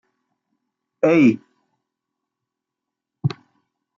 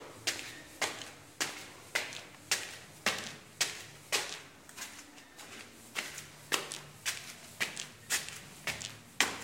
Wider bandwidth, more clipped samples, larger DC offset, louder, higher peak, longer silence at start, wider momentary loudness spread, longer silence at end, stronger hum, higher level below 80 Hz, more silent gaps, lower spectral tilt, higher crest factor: second, 7.2 kHz vs 17 kHz; neither; neither; first, -19 LUFS vs -37 LUFS; about the same, -4 dBFS vs -6 dBFS; first, 1.05 s vs 0 s; first, 16 LU vs 13 LU; first, 0.65 s vs 0 s; neither; about the same, -70 dBFS vs -72 dBFS; neither; first, -8 dB/octave vs -0.5 dB/octave; second, 20 dB vs 32 dB